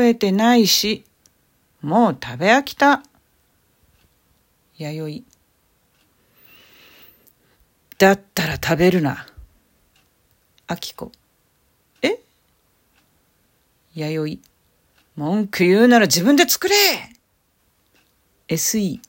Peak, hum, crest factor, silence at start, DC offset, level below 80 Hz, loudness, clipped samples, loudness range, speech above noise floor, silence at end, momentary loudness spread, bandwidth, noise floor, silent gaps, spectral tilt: 0 dBFS; none; 20 dB; 0 s; under 0.1%; -54 dBFS; -18 LUFS; under 0.1%; 20 LU; 47 dB; 0.1 s; 18 LU; 17 kHz; -65 dBFS; none; -4 dB/octave